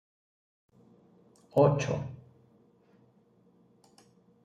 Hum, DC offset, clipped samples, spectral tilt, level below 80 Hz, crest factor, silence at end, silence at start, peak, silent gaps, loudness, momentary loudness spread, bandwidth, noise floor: none; under 0.1%; under 0.1%; -7 dB/octave; -70 dBFS; 22 dB; 2.25 s; 1.55 s; -12 dBFS; none; -28 LUFS; 20 LU; 9.8 kHz; -65 dBFS